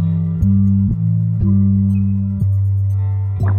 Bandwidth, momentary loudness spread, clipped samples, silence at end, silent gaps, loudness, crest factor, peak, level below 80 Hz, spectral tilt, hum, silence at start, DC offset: 2.1 kHz; 4 LU; under 0.1%; 0 s; none; -16 LUFS; 10 dB; -6 dBFS; -32 dBFS; -12 dB/octave; none; 0 s; under 0.1%